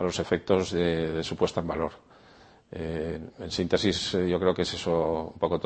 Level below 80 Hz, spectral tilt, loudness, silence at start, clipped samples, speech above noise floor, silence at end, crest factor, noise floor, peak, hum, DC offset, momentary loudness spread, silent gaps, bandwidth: -50 dBFS; -5.5 dB/octave; -28 LUFS; 0 s; under 0.1%; 27 dB; 0 s; 22 dB; -55 dBFS; -6 dBFS; none; under 0.1%; 9 LU; none; 8.8 kHz